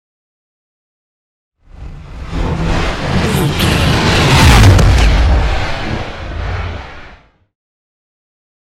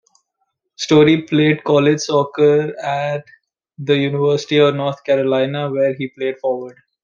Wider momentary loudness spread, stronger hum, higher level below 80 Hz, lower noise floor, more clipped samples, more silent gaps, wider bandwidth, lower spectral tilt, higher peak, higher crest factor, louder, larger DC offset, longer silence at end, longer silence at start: first, 18 LU vs 10 LU; neither; first, -18 dBFS vs -62 dBFS; second, -40 dBFS vs -72 dBFS; neither; neither; first, 16 kHz vs 7.4 kHz; about the same, -5 dB/octave vs -6 dB/octave; about the same, 0 dBFS vs -2 dBFS; about the same, 14 dB vs 16 dB; first, -12 LUFS vs -16 LUFS; neither; first, 1.55 s vs 0.3 s; first, 1.8 s vs 0.8 s